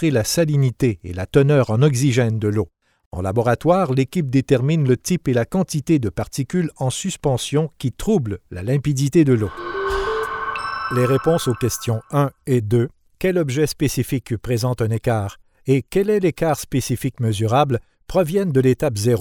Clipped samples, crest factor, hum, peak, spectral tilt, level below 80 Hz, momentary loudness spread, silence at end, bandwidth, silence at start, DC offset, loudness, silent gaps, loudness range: under 0.1%; 16 dB; none; -2 dBFS; -6 dB/octave; -44 dBFS; 8 LU; 0 s; 18.5 kHz; 0 s; under 0.1%; -20 LUFS; 3.06-3.11 s; 2 LU